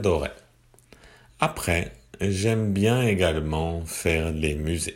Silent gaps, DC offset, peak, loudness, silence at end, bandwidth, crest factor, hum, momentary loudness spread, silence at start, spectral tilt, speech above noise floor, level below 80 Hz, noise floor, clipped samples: none; under 0.1%; -4 dBFS; -25 LUFS; 0 s; 16.5 kHz; 20 dB; none; 7 LU; 0 s; -5.5 dB/octave; 33 dB; -38 dBFS; -57 dBFS; under 0.1%